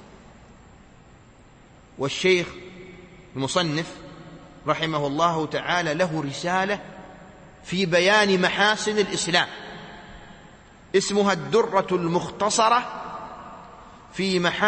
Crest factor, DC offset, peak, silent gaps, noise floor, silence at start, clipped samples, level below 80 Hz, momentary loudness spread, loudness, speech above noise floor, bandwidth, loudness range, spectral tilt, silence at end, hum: 20 dB; under 0.1%; -4 dBFS; none; -51 dBFS; 0 s; under 0.1%; -56 dBFS; 23 LU; -23 LUFS; 28 dB; 8.8 kHz; 5 LU; -4 dB/octave; 0 s; none